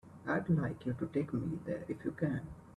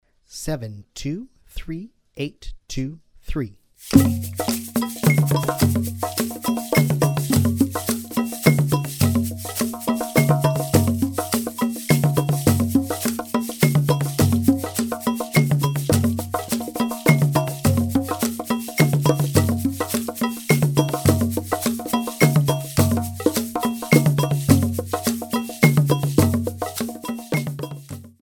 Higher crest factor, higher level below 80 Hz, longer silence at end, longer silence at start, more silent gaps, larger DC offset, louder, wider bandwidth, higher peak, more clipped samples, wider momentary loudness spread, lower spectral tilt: about the same, 16 dB vs 20 dB; second, -62 dBFS vs -44 dBFS; second, 0 s vs 0.15 s; second, 0.05 s vs 0.3 s; neither; neither; second, -37 LUFS vs -21 LUFS; second, 10.5 kHz vs over 20 kHz; second, -20 dBFS vs 0 dBFS; neither; second, 7 LU vs 12 LU; first, -9.5 dB/octave vs -5.5 dB/octave